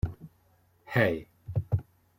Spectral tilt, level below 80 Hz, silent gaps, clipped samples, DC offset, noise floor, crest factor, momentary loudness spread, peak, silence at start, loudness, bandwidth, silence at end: -8 dB/octave; -48 dBFS; none; under 0.1%; under 0.1%; -66 dBFS; 22 dB; 11 LU; -10 dBFS; 0.05 s; -31 LUFS; 16.5 kHz; 0.35 s